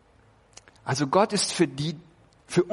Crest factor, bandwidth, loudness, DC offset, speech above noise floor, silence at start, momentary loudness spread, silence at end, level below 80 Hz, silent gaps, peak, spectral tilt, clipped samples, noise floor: 20 dB; 11.5 kHz; -25 LUFS; under 0.1%; 34 dB; 0.85 s; 13 LU; 0 s; -62 dBFS; none; -6 dBFS; -4.5 dB/octave; under 0.1%; -59 dBFS